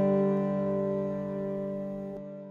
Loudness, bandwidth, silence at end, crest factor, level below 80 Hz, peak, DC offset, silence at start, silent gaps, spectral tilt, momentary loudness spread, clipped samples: -31 LUFS; 4.1 kHz; 0 s; 12 dB; -62 dBFS; -18 dBFS; under 0.1%; 0 s; none; -10.5 dB/octave; 12 LU; under 0.1%